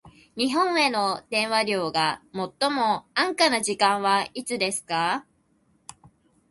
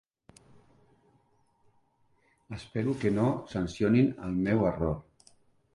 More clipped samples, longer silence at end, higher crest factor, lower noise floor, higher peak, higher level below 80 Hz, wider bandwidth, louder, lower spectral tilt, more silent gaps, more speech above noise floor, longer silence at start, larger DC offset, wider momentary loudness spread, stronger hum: neither; first, 1.3 s vs 0.75 s; about the same, 20 dB vs 18 dB; second, -65 dBFS vs -69 dBFS; first, -6 dBFS vs -14 dBFS; second, -66 dBFS vs -52 dBFS; about the same, 12 kHz vs 11.5 kHz; first, -24 LUFS vs -29 LUFS; second, -2.5 dB/octave vs -8 dB/octave; neither; about the same, 41 dB vs 41 dB; second, 0.05 s vs 2.5 s; neither; second, 7 LU vs 13 LU; neither